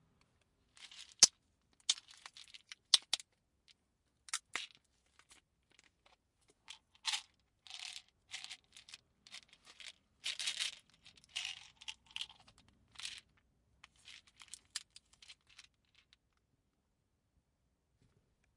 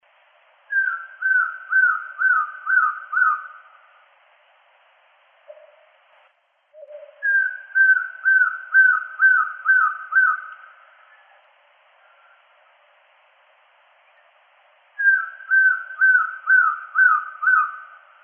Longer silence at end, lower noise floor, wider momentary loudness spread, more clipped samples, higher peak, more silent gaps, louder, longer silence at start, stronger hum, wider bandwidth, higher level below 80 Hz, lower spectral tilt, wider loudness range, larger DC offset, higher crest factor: first, 3.25 s vs 0.4 s; first, -82 dBFS vs -62 dBFS; first, 26 LU vs 7 LU; neither; about the same, -4 dBFS vs -6 dBFS; neither; second, -37 LUFS vs -18 LUFS; about the same, 0.8 s vs 0.7 s; neither; first, 11.5 kHz vs 3.3 kHz; first, -82 dBFS vs under -90 dBFS; first, 3 dB/octave vs 23 dB/octave; first, 20 LU vs 10 LU; neither; first, 40 dB vs 16 dB